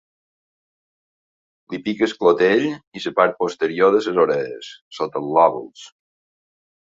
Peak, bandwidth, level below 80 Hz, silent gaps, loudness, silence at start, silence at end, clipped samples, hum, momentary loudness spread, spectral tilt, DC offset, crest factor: -2 dBFS; 7.8 kHz; -64 dBFS; 2.87-2.92 s, 4.81-4.91 s; -19 LUFS; 1.7 s; 1 s; under 0.1%; none; 15 LU; -5.5 dB/octave; under 0.1%; 20 dB